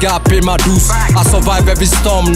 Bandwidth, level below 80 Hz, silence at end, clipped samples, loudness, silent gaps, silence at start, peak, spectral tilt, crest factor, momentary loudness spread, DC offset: 16.5 kHz; -14 dBFS; 0 s; under 0.1%; -11 LUFS; none; 0 s; 0 dBFS; -4.5 dB/octave; 10 dB; 1 LU; under 0.1%